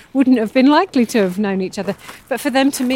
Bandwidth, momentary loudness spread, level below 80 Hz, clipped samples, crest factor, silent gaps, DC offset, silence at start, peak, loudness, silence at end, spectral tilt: 16.5 kHz; 12 LU; -58 dBFS; under 0.1%; 14 dB; none; under 0.1%; 0.15 s; -2 dBFS; -16 LUFS; 0 s; -5 dB/octave